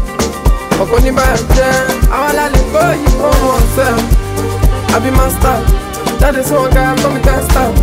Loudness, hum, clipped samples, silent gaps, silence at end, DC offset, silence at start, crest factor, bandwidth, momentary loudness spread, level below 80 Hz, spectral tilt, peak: -12 LUFS; none; under 0.1%; none; 0 s; under 0.1%; 0 s; 10 dB; 16.5 kHz; 4 LU; -14 dBFS; -5 dB/octave; 0 dBFS